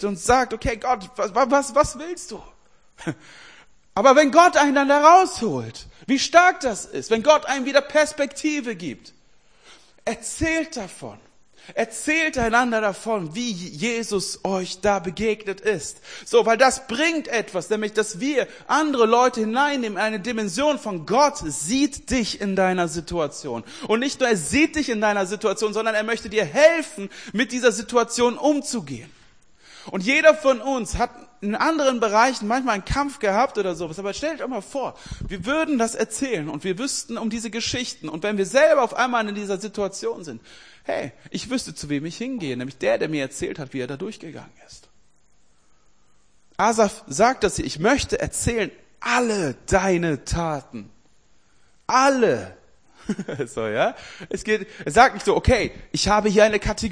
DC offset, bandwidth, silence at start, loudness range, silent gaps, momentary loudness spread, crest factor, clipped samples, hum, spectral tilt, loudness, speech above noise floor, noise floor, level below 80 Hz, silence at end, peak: 0.2%; 10.5 kHz; 0 s; 9 LU; none; 15 LU; 22 dB; under 0.1%; none; -4 dB/octave; -21 LUFS; 42 dB; -63 dBFS; -44 dBFS; 0 s; 0 dBFS